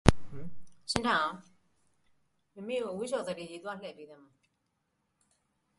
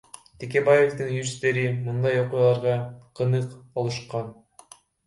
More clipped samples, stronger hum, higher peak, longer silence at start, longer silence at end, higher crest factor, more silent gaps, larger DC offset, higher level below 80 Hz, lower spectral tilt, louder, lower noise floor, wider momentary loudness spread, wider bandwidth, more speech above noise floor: neither; neither; first, 0 dBFS vs -6 dBFS; second, 0.05 s vs 0.4 s; first, 1.65 s vs 0.75 s; first, 34 dB vs 18 dB; neither; neither; first, -46 dBFS vs -62 dBFS; about the same, -5 dB/octave vs -6 dB/octave; second, -34 LUFS vs -24 LUFS; first, -79 dBFS vs -52 dBFS; first, 21 LU vs 13 LU; about the same, 11.5 kHz vs 11.5 kHz; first, 44 dB vs 28 dB